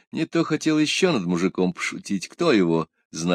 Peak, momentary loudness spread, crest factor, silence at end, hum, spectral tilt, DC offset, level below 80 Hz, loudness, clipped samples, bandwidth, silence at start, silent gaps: -6 dBFS; 9 LU; 16 dB; 0 s; none; -5 dB/octave; under 0.1%; -64 dBFS; -23 LUFS; under 0.1%; 13.5 kHz; 0.15 s; 3.05-3.10 s